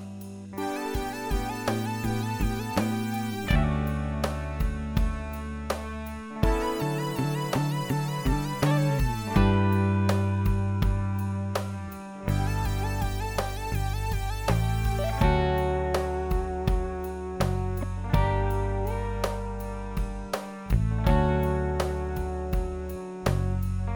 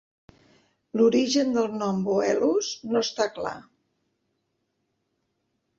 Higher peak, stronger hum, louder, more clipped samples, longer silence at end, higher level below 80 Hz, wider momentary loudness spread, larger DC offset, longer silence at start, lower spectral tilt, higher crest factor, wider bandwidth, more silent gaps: about the same, -8 dBFS vs -10 dBFS; neither; second, -28 LUFS vs -25 LUFS; neither; second, 0 s vs 2.2 s; first, -32 dBFS vs -68 dBFS; about the same, 10 LU vs 12 LU; neither; second, 0 s vs 0.95 s; first, -6.5 dB/octave vs -4.5 dB/octave; about the same, 18 dB vs 18 dB; first, over 20 kHz vs 7.8 kHz; neither